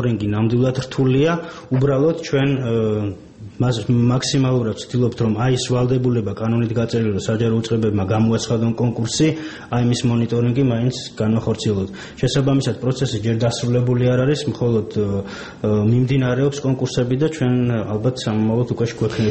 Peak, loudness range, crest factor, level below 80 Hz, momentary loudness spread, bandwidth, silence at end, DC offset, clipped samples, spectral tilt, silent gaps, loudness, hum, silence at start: -6 dBFS; 1 LU; 12 dB; -46 dBFS; 5 LU; 8.6 kHz; 0 s; 0.1%; under 0.1%; -6.5 dB/octave; none; -19 LUFS; none; 0 s